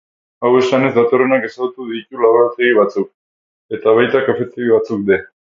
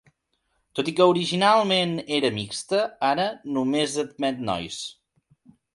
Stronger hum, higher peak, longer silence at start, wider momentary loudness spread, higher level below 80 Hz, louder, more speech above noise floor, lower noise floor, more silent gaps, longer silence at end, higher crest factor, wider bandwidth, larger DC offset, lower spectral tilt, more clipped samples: neither; first, 0 dBFS vs -4 dBFS; second, 0.4 s vs 0.75 s; about the same, 11 LU vs 11 LU; about the same, -58 dBFS vs -62 dBFS; first, -15 LUFS vs -23 LUFS; first, over 76 dB vs 50 dB; first, under -90 dBFS vs -73 dBFS; first, 3.14-3.69 s vs none; second, 0.35 s vs 0.8 s; about the same, 16 dB vs 20 dB; second, 7.4 kHz vs 11.5 kHz; neither; first, -6.5 dB/octave vs -4.5 dB/octave; neither